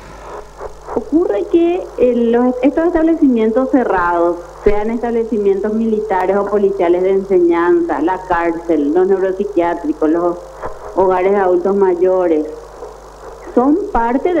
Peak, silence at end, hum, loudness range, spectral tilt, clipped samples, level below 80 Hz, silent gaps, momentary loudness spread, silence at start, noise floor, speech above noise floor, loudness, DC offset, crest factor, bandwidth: 0 dBFS; 0 s; none; 2 LU; -7.5 dB/octave; under 0.1%; -36 dBFS; none; 16 LU; 0 s; -34 dBFS; 20 dB; -14 LUFS; under 0.1%; 14 dB; 8.4 kHz